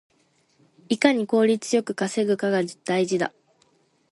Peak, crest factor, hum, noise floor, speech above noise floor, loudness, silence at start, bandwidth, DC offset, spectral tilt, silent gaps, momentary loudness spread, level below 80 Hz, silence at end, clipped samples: -2 dBFS; 22 dB; none; -65 dBFS; 42 dB; -23 LUFS; 0.9 s; 11.5 kHz; under 0.1%; -5 dB/octave; none; 6 LU; -72 dBFS; 0.85 s; under 0.1%